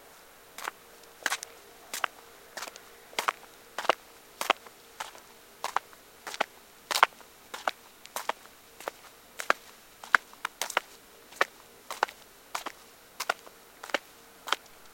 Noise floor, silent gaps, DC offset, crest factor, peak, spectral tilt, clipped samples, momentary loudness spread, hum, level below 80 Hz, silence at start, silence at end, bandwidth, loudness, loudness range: -54 dBFS; none; under 0.1%; 36 dB; 0 dBFS; 0.5 dB/octave; under 0.1%; 24 LU; none; -72 dBFS; 0.6 s; 0.05 s; 17 kHz; -33 LUFS; 4 LU